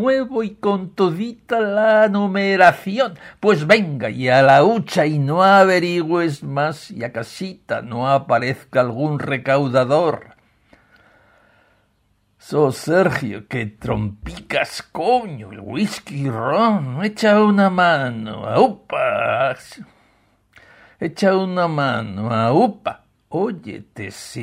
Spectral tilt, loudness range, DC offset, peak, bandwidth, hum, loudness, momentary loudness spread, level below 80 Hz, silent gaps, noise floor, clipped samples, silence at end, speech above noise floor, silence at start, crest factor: -6.5 dB/octave; 8 LU; under 0.1%; 0 dBFS; 15.5 kHz; none; -18 LUFS; 15 LU; -52 dBFS; none; -63 dBFS; under 0.1%; 0 s; 45 dB; 0 s; 18 dB